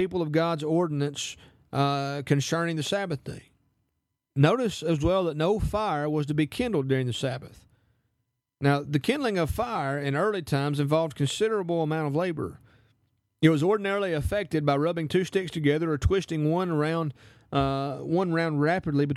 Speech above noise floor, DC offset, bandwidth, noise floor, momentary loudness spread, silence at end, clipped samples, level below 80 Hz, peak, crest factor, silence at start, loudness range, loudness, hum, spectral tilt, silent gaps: 54 dB; under 0.1%; 13.5 kHz; -79 dBFS; 6 LU; 0 s; under 0.1%; -46 dBFS; -6 dBFS; 20 dB; 0 s; 3 LU; -27 LUFS; none; -6.5 dB/octave; none